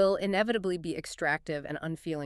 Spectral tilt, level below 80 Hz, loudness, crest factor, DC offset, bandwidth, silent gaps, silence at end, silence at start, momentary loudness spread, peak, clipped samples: -5.5 dB/octave; -60 dBFS; -31 LUFS; 16 dB; under 0.1%; 13 kHz; none; 0 s; 0 s; 8 LU; -14 dBFS; under 0.1%